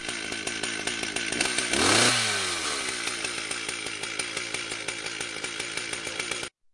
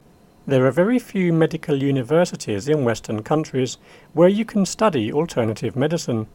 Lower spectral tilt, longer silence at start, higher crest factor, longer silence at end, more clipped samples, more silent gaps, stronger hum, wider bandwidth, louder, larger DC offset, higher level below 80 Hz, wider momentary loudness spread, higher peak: second, -1 dB/octave vs -6.5 dB/octave; second, 0 s vs 0.45 s; about the same, 22 dB vs 18 dB; first, 0.25 s vs 0.1 s; neither; neither; neither; second, 11.5 kHz vs 17 kHz; second, -27 LUFS vs -20 LUFS; neither; about the same, -58 dBFS vs -54 dBFS; first, 11 LU vs 8 LU; second, -8 dBFS vs -2 dBFS